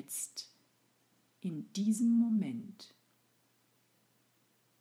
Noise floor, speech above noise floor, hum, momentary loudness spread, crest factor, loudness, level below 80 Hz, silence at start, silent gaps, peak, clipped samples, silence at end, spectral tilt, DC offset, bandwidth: -73 dBFS; 40 dB; none; 21 LU; 16 dB; -34 LUFS; under -90 dBFS; 0 s; none; -22 dBFS; under 0.1%; 1.95 s; -5 dB/octave; under 0.1%; 15.5 kHz